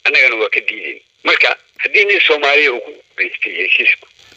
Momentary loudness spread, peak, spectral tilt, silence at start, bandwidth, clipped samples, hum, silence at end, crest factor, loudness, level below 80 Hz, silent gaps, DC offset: 11 LU; 0 dBFS; -1 dB/octave; 0.05 s; 8.2 kHz; under 0.1%; none; 0.4 s; 16 dB; -12 LUFS; -70 dBFS; none; under 0.1%